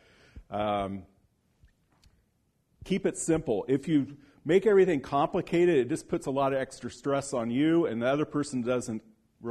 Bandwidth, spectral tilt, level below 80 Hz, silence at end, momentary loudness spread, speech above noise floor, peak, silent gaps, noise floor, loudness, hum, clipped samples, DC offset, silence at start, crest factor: 12.5 kHz; -6 dB/octave; -58 dBFS; 0 s; 13 LU; 45 dB; -12 dBFS; none; -72 dBFS; -28 LUFS; none; under 0.1%; under 0.1%; 0.35 s; 18 dB